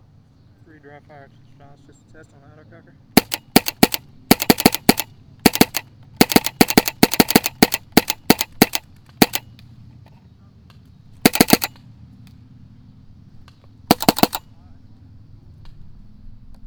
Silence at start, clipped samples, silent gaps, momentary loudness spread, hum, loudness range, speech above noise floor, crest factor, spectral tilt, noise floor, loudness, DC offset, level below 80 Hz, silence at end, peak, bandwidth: 3.15 s; under 0.1%; none; 6 LU; none; 7 LU; 24 dB; 20 dB; -3.5 dB/octave; -51 dBFS; -17 LUFS; under 0.1%; -44 dBFS; 0 s; 0 dBFS; over 20 kHz